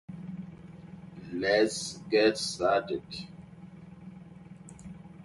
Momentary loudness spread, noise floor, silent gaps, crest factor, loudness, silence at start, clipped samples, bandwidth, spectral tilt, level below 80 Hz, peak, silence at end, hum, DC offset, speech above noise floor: 23 LU; -49 dBFS; none; 22 dB; -28 LUFS; 0.1 s; under 0.1%; 11.5 kHz; -4 dB/octave; -62 dBFS; -12 dBFS; 0 s; none; under 0.1%; 21 dB